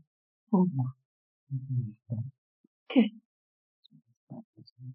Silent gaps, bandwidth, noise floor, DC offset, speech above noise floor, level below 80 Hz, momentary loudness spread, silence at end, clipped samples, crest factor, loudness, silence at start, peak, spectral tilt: 1.05-1.47 s, 2.38-2.86 s, 3.25-3.83 s, 4.17-4.27 s, 4.44-4.53 s, 4.72-4.76 s; 4.3 kHz; under -90 dBFS; under 0.1%; over 60 dB; -78 dBFS; 22 LU; 0 s; under 0.1%; 24 dB; -31 LUFS; 0.5 s; -10 dBFS; -7.5 dB/octave